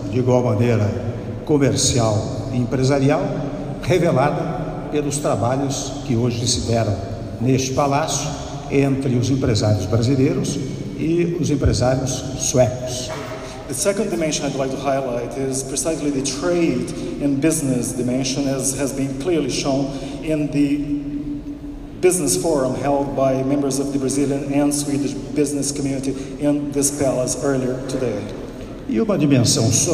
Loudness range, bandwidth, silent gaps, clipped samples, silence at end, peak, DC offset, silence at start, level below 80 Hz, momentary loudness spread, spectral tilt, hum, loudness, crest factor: 2 LU; 15.5 kHz; none; under 0.1%; 0 s; -2 dBFS; under 0.1%; 0 s; -38 dBFS; 9 LU; -5 dB/octave; none; -20 LUFS; 18 dB